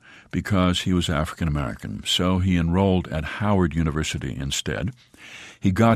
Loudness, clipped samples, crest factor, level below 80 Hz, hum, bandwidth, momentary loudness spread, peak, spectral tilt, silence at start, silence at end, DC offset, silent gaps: -23 LUFS; under 0.1%; 18 dB; -38 dBFS; none; 15 kHz; 10 LU; -6 dBFS; -5.5 dB/octave; 0.1 s; 0 s; under 0.1%; none